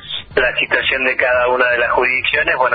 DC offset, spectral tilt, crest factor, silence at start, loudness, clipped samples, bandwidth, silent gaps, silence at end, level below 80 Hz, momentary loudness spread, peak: under 0.1%; -7 dB/octave; 16 dB; 0 s; -14 LUFS; under 0.1%; 5 kHz; none; 0 s; -44 dBFS; 2 LU; 0 dBFS